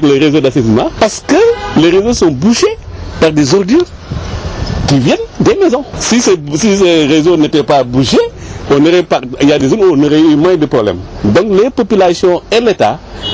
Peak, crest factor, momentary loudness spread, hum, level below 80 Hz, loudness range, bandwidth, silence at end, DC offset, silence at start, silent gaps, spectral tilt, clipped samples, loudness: 0 dBFS; 10 dB; 8 LU; none; -30 dBFS; 2 LU; 8 kHz; 0 s; under 0.1%; 0 s; none; -5.5 dB/octave; 0.1%; -10 LUFS